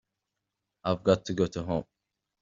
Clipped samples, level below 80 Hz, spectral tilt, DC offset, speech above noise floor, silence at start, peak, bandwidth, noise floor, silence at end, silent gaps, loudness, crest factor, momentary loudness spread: under 0.1%; -58 dBFS; -6 dB/octave; under 0.1%; 57 dB; 0.85 s; -10 dBFS; 7.6 kHz; -85 dBFS; 0.6 s; none; -29 LUFS; 22 dB; 8 LU